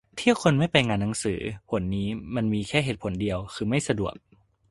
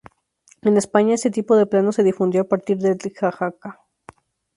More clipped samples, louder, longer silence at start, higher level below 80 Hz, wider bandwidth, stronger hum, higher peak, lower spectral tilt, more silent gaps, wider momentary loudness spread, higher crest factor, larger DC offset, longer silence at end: neither; second, -26 LUFS vs -19 LUFS; second, 0.15 s vs 0.65 s; first, -48 dBFS vs -64 dBFS; about the same, 11.5 kHz vs 11.5 kHz; neither; about the same, -2 dBFS vs 0 dBFS; about the same, -5.5 dB/octave vs -6 dB/octave; neither; about the same, 8 LU vs 10 LU; about the same, 24 dB vs 20 dB; neither; second, 0.6 s vs 0.85 s